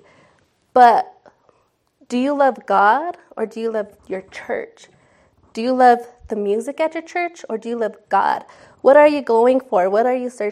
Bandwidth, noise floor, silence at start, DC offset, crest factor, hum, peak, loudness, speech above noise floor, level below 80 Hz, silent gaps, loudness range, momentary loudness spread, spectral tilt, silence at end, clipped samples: 12.5 kHz; -63 dBFS; 0.75 s; under 0.1%; 18 dB; none; 0 dBFS; -18 LUFS; 46 dB; -62 dBFS; none; 5 LU; 16 LU; -5 dB/octave; 0 s; under 0.1%